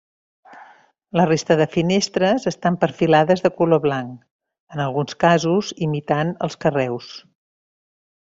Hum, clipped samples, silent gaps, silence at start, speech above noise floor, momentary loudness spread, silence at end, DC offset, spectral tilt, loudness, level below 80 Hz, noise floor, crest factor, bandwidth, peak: none; under 0.1%; 4.31-4.39 s, 4.60-4.67 s; 0.5 s; 31 dB; 10 LU; 1.05 s; under 0.1%; -6 dB/octave; -19 LUFS; -58 dBFS; -50 dBFS; 18 dB; 7.8 kHz; -2 dBFS